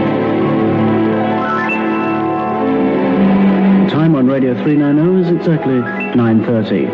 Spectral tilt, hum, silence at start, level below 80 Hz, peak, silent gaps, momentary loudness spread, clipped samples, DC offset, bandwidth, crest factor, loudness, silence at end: -9.5 dB/octave; none; 0 s; -48 dBFS; -2 dBFS; none; 5 LU; under 0.1%; under 0.1%; 5.6 kHz; 10 dB; -13 LUFS; 0 s